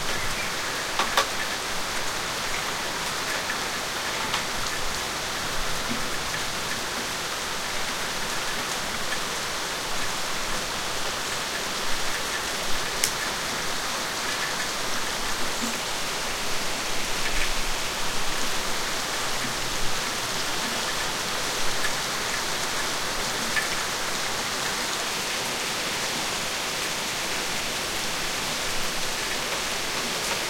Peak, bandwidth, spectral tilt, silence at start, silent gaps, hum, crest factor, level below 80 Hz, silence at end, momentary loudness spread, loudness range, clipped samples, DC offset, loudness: -2 dBFS; 16.5 kHz; -1 dB/octave; 0 s; none; none; 26 dB; -42 dBFS; 0 s; 2 LU; 2 LU; under 0.1%; under 0.1%; -26 LUFS